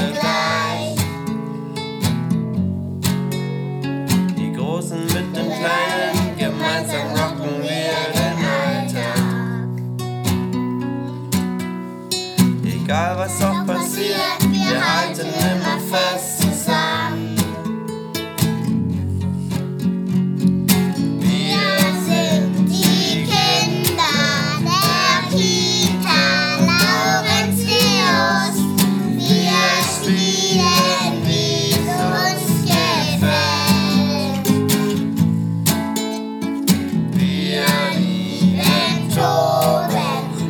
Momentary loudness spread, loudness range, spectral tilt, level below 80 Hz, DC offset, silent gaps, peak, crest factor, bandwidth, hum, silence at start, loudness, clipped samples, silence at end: 9 LU; 6 LU; -4.5 dB/octave; -52 dBFS; under 0.1%; none; 0 dBFS; 18 dB; over 20 kHz; none; 0 s; -18 LUFS; under 0.1%; 0 s